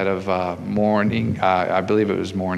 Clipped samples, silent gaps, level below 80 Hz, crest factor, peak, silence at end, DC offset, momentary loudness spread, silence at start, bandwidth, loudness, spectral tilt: under 0.1%; none; -52 dBFS; 16 dB; -4 dBFS; 0 s; under 0.1%; 5 LU; 0 s; 10.5 kHz; -20 LUFS; -7.5 dB/octave